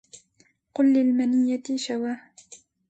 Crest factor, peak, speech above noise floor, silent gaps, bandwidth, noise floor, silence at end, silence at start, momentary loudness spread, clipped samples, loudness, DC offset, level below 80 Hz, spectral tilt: 14 dB; -12 dBFS; 42 dB; none; 8.6 kHz; -64 dBFS; 0.35 s; 0.15 s; 13 LU; under 0.1%; -23 LUFS; under 0.1%; -74 dBFS; -4 dB/octave